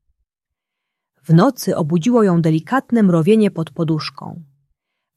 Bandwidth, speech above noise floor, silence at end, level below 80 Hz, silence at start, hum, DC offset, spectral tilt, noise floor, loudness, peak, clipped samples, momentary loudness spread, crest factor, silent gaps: 14.5 kHz; 68 dB; 0.75 s; -62 dBFS; 1.3 s; none; under 0.1%; -7.5 dB/octave; -83 dBFS; -16 LUFS; -2 dBFS; under 0.1%; 9 LU; 16 dB; none